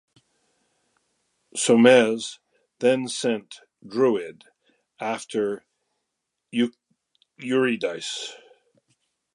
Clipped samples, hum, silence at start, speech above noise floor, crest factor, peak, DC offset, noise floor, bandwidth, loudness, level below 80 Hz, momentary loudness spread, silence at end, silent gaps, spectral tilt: under 0.1%; none; 1.55 s; 59 dB; 22 dB; -2 dBFS; under 0.1%; -81 dBFS; 11.5 kHz; -23 LUFS; -78 dBFS; 20 LU; 1 s; none; -4 dB/octave